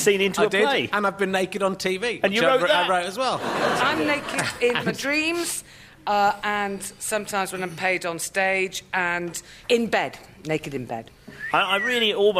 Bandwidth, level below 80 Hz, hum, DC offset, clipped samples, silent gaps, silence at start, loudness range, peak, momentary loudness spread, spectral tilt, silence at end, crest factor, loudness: 15.5 kHz; -58 dBFS; none; under 0.1%; under 0.1%; none; 0 s; 4 LU; -6 dBFS; 10 LU; -3 dB/octave; 0 s; 18 dB; -23 LUFS